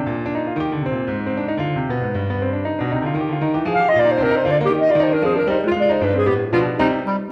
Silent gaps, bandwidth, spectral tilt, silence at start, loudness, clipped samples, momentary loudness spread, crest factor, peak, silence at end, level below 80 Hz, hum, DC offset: none; 6.8 kHz; -9 dB/octave; 0 s; -19 LUFS; under 0.1%; 7 LU; 14 dB; -6 dBFS; 0 s; -46 dBFS; none; under 0.1%